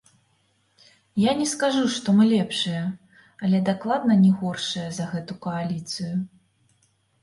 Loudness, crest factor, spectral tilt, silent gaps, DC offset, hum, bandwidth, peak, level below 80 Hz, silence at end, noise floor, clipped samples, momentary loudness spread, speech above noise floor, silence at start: -23 LUFS; 16 dB; -5.5 dB/octave; none; under 0.1%; none; 11.5 kHz; -8 dBFS; -66 dBFS; 0.95 s; -66 dBFS; under 0.1%; 12 LU; 44 dB; 1.15 s